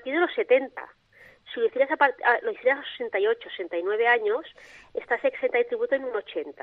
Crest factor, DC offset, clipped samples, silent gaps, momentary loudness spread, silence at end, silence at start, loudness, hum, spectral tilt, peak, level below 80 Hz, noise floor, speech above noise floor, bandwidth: 20 dB; under 0.1%; under 0.1%; none; 14 LU; 0.1 s; 0.05 s; -25 LUFS; none; -4.5 dB/octave; -6 dBFS; -72 dBFS; -53 dBFS; 27 dB; 5 kHz